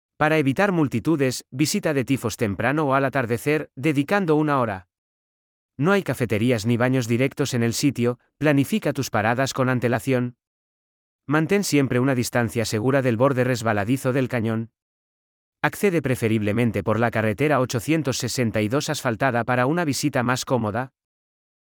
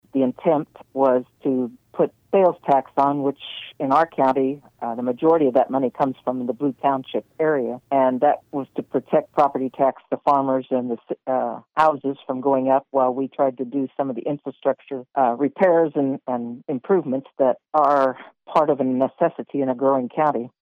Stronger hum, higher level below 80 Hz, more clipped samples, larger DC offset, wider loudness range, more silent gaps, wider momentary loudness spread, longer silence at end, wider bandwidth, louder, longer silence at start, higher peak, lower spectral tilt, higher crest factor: neither; first, -60 dBFS vs -70 dBFS; neither; neither; about the same, 2 LU vs 2 LU; first, 4.98-5.69 s, 10.47-11.19 s, 14.82-15.53 s vs none; second, 5 LU vs 10 LU; first, 0.9 s vs 0.15 s; first, 19.5 kHz vs 6.8 kHz; about the same, -22 LUFS vs -22 LUFS; about the same, 0.2 s vs 0.15 s; about the same, -4 dBFS vs -6 dBFS; second, -5.5 dB/octave vs -8.5 dB/octave; about the same, 18 dB vs 16 dB